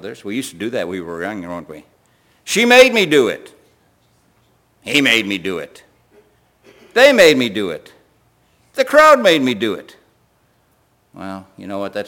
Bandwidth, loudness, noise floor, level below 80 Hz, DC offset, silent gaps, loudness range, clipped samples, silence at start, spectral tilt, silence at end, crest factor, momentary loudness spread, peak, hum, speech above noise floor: 17 kHz; -14 LUFS; -59 dBFS; -58 dBFS; under 0.1%; none; 6 LU; under 0.1%; 0.05 s; -3 dB/octave; 0 s; 18 dB; 23 LU; 0 dBFS; none; 44 dB